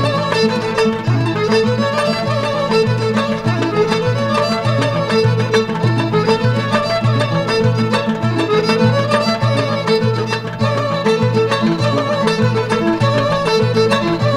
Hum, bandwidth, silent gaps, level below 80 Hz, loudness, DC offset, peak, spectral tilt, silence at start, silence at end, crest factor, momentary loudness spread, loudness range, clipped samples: none; 11.5 kHz; none; -46 dBFS; -15 LUFS; under 0.1%; 0 dBFS; -6 dB/octave; 0 s; 0 s; 14 dB; 3 LU; 1 LU; under 0.1%